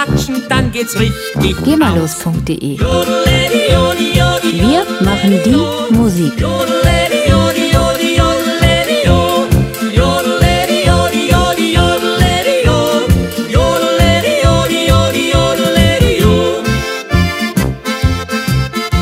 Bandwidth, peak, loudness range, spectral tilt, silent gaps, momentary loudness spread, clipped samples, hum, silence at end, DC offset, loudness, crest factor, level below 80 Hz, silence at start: 16.5 kHz; 0 dBFS; 2 LU; -5 dB/octave; none; 5 LU; under 0.1%; none; 0 s; under 0.1%; -12 LUFS; 12 dB; -22 dBFS; 0 s